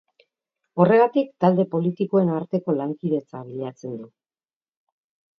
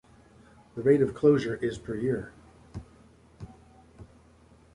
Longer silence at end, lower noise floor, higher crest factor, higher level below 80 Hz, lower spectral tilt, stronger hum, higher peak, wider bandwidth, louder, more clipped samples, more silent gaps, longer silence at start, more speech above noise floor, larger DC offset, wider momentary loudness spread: first, 1.35 s vs 0.7 s; first, under -90 dBFS vs -57 dBFS; about the same, 20 dB vs 20 dB; second, -72 dBFS vs -56 dBFS; first, -9.5 dB/octave vs -8 dB/octave; neither; first, -4 dBFS vs -10 dBFS; second, 6.6 kHz vs 11 kHz; first, -22 LUFS vs -26 LUFS; neither; neither; about the same, 0.75 s vs 0.75 s; first, over 69 dB vs 32 dB; neither; second, 17 LU vs 25 LU